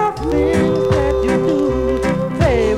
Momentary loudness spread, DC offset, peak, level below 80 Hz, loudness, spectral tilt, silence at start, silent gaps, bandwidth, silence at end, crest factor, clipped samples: 2 LU; under 0.1%; -2 dBFS; -28 dBFS; -16 LUFS; -7 dB/octave; 0 s; none; 13 kHz; 0 s; 14 dB; under 0.1%